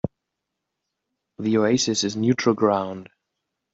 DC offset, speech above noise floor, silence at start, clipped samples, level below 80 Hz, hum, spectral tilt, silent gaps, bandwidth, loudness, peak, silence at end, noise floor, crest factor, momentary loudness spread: under 0.1%; 61 dB; 0.05 s; under 0.1%; -62 dBFS; none; -4.5 dB/octave; none; 8 kHz; -22 LUFS; -6 dBFS; 0.7 s; -82 dBFS; 20 dB; 13 LU